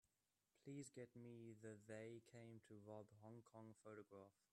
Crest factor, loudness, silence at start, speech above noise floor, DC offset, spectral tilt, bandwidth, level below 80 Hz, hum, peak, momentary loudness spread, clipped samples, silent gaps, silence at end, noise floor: 18 dB; -61 LUFS; 0.55 s; over 29 dB; under 0.1%; -6 dB/octave; 11.5 kHz; under -90 dBFS; none; -44 dBFS; 7 LU; under 0.1%; none; 0.2 s; under -90 dBFS